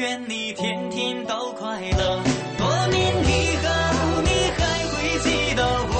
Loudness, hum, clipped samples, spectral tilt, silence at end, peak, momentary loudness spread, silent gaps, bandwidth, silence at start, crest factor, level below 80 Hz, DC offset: -22 LUFS; none; under 0.1%; -4.5 dB/octave; 0 s; -8 dBFS; 7 LU; none; 8.8 kHz; 0 s; 16 dB; -32 dBFS; under 0.1%